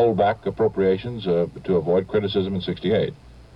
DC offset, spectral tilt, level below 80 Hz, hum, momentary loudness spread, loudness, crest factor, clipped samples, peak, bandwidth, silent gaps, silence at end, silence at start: under 0.1%; -8.5 dB/octave; -50 dBFS; none; 5 LU; -23 LUFS; 14 dB; under 0.1%; -8 dBFS; 5.6 kHz; none; 0.15 s; 0 s